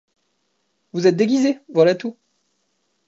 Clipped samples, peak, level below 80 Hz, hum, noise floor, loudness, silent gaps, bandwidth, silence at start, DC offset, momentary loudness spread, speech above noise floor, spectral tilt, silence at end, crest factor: under 0.1%; -4 dBFS; -72 dBFS; none; -70 dBFS; -18 LUFS; none; 7.8 kHz; 0.95 s; under 0.1%; 12 LU; 53 dB; -6 dB/octave; 0.95 s; 18 dB